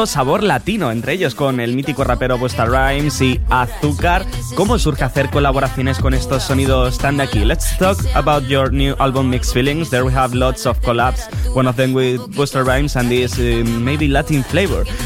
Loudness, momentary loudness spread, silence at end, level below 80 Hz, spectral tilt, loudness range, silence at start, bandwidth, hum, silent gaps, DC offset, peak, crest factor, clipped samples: -16 LUFS; 3 LU; 0 s; -22 dBFS; -5.5 dB/octave; 1 LU; 0 s; 16.5 kHz; none; none; under 0.1%; -2 dBFS; 14 dB; under 0.1%